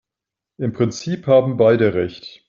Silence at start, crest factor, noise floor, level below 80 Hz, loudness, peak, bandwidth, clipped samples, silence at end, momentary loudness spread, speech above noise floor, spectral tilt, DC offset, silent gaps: 0.6 s; 16 dB; -86 dBFS; -56 dBFS; -18 LUFS; -2 dBFS; 7.4 kHz; under 0.1%; 0.2 s; 12 LU; 68 dB; -6.5 dB/octave; under 0.1%; none